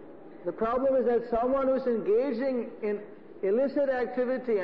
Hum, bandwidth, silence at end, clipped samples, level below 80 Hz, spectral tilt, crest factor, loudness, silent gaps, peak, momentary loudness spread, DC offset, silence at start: none; 5.4 kHz; 0 s; under 0.1%; -58 dBFS; -8.5 dB/octave; 10 dB; -28 LUFS; none; -18 dBFS; 11 LU; 0.3%; 0 s